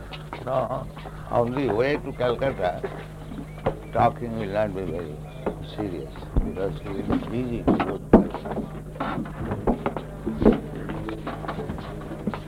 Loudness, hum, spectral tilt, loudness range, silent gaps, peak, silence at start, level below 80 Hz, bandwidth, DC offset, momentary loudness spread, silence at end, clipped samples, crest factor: -27 LUFS; none; -8 dB/octave; 4 LU; none; -2 dBFS; 0 s; -38 dBFS; 16 kHz; under 0.1%; 13 LU; 0 s; under 0.1%; 24 dB